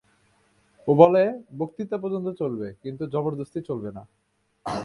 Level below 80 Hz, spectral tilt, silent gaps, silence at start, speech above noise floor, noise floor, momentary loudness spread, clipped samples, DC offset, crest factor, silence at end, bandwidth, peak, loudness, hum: -62 dBFS; -8.5 dB/octave; none; 0.85 s; 40 dB; -64 dBFS; 18 LU; under 0.1%; under 0.1%; 24 dB; 0 s; 11 kHz; 0 dBFS; -24 LUFS; none